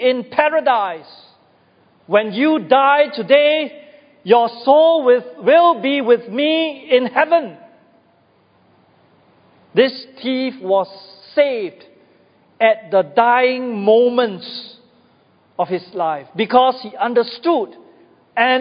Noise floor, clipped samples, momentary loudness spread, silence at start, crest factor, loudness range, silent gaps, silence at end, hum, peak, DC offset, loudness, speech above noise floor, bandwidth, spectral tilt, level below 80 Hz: -56 dBFS; under 0.1%; 13 LU; 0 s; 18 dB; 7 LU; none; 0 s; none; 0 dBFS; under 0.1%; -16 LUFS; 40 dB; 5.2 kHz; -8.5 dB/octave; -72 dBFS